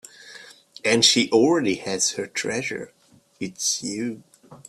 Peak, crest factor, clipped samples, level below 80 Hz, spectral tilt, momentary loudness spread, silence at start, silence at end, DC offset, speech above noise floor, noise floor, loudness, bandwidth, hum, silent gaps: -2 dBFS; 22 dB; under 0.1%; -66 dBFS; -2.5 dB/octave; 26 LU; 0.2 s; 0.15 s; under 0.1%; 23 dB; -46 dBFS; -21 LUFS; 14 kHz; none; none